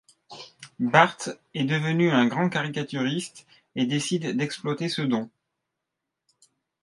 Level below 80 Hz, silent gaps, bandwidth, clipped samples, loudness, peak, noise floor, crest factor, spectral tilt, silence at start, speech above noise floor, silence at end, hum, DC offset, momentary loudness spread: -72 dBFS; none; 11.5 kHz; under 0.1%; -25 LUFS; 0 dBFS; -84 dBFS; 26 dB; -5 dB/octave; 0.3 s; 60 dB; 1.55 s; none; under 0.1%; 19 LU